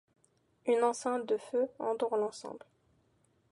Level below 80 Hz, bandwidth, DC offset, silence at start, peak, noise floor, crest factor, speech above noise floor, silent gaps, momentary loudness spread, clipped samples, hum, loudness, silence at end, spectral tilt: -82 dBFS; 11.5 kHz; under 0.1%; 0.65 s; -16 dBFS; -72 dBFS; 18 dB; 39 dB; none; 15 LU; under 0.1%; none; -33 LUFS; 0.95 s; -4 dB/octave